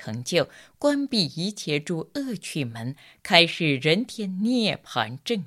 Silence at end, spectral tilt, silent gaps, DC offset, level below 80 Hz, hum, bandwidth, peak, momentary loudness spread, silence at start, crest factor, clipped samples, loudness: 0 s; -4.5 dB/octave; none; under 0.1%; -66 dBFS; none; 16 kHz; 0 dBFS; 13 LU; 0 s; 24 dB; under 0.1%; -24 LUFS